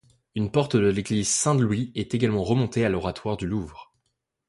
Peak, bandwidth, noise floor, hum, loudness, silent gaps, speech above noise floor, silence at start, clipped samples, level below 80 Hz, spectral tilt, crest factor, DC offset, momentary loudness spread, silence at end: -8 dBFS; 11.5 kHz; -77 dBFS; none; -24 LUFS; none; 53 dB; 0.35 s; under 0.1%; -48 dBFS; -5 dB/octave; 18 dB; under 0.1%; 9 LU; 0.65 s